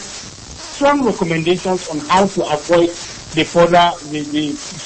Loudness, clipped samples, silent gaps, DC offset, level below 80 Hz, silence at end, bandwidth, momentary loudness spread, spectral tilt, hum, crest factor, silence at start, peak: -16 LUFS; under 0.1%; none; under 0.1%; -44 dBFS; 0 s; 8.8 kHz; 16 LU; -4.5 dB/octave; none; 16 dB; 0 s; 0 dBFS